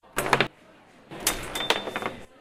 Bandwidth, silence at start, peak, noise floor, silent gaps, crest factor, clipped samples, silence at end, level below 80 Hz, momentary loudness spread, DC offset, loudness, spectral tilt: 16 kHz; 0.05 s; -2 dBFS; -54 dBFS; none; 28 dB; under 0.1%; 0.15 s; -50 dBFS; 10 LU; under 0.1%; -27 LUFS; -2 dB/octave